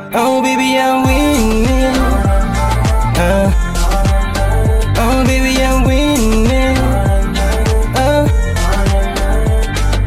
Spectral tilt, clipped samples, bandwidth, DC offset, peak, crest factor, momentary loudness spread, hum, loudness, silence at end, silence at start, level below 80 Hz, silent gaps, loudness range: -5.5 dB/octave; under 0.1%; 15.5 kHz; under 0.1%; 0 dBFS; 10 dB; 3 LU; none; -13 LUFS; 0 s; 0 s; -14 dBFS; none; 1 LU